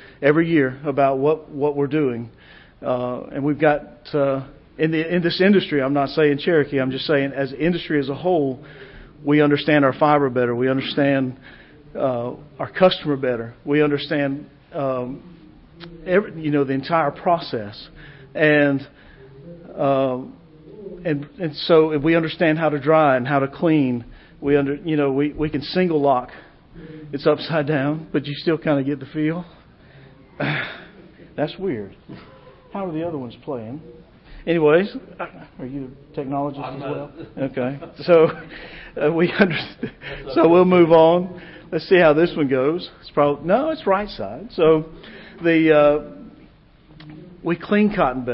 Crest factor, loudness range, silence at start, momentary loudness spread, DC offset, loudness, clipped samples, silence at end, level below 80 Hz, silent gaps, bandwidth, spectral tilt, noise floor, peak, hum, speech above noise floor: 18 dB; 7 LU; 0 s; 17 LU; under 0.1%; -20 LUFS; under 0.1%; 0 s; -50 dBFS; none; 5.8 kHz; -11.5 dB/octave; -49 dBFS; -2 dBFS; none; 30 dB